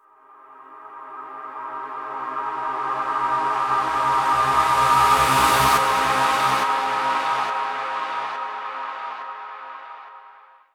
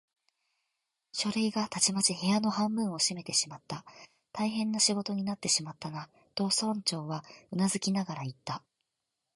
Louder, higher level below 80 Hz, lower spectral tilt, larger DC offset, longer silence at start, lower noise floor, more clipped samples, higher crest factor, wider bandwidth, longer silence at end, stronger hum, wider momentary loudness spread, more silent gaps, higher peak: first, -21 LUFS vs -30 LUFS; first, -50 dBFS vs -74 dBFS; about the same, -2.5 dB/octave vs -3 dB/octave; neither; second, 0.5 s vs 1.15 s; second, -50 dBFS vs -85 dBFS; neither; about the same, 18 dB vs 22 dB; first, 19.5 kHz vs 11.5 kHz; second, 0.45 s vs 0.8 s; neither; first, 20 LU vs 14 LU; neither; first, -4 dBFS vs -10 dBFS